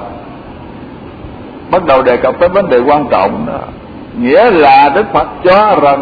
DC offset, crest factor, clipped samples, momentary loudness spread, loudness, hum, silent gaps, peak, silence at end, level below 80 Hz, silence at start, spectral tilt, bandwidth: under 0.1%; 10 dB; 0.2%; 23 LU; -9 LUFS; none; none; 0 dBFS; 0 s; -36 dBFS; 0 s; -8 dB/octave; 5.4 kHz